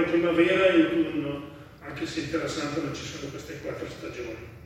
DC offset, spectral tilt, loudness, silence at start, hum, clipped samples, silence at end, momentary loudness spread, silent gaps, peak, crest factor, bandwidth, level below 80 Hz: under 0.1%; -5.5 dB/octave; -27 LUFS; 0 s; none; under 0.1%; 0 s; 17 LU; none; -8 dBFS; 18 dB; 13 kHz; -56 dBFS